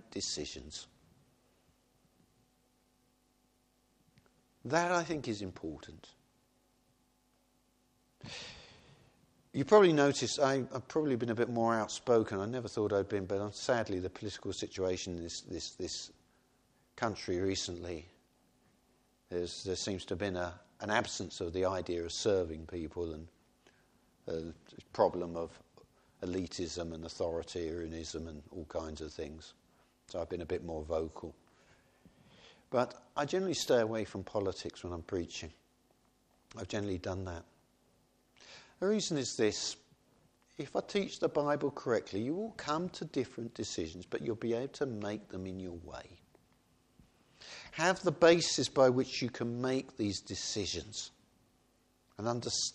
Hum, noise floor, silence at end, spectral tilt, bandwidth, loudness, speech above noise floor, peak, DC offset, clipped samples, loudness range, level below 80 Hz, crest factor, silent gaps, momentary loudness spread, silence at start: none; -73 dBFS; 0.05 s; -4.5 dB/octave; 13 kHz; -35 LUFS; 38 dB; -12 dBFS; under 0.1%; under 0.1%; 11 LU; -62 dBFS; 24 dB; none; 16 LU; 0.1 s